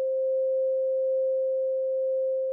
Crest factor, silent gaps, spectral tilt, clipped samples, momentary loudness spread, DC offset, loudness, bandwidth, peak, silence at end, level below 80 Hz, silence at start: 4 dB; none; -6.5 dB/octave; under 0.1%; 1 LU; under 0.1%; -27 LUFS; 0.8 kHz; -22 dBFS; 0 s; under -90 dBFS; 0 s